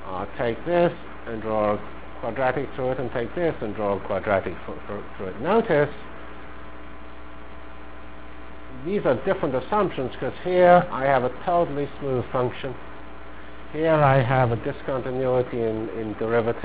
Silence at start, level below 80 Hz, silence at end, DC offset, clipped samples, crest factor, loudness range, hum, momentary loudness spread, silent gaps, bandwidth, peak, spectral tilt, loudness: 0 s; -46 dBFS; 0 s; 2%; under 0.1%; 22 dB; 6 LU; none; 23 LU; none; 4 kHz; -2 dBFS; -11 dB/octave; -24 LUFS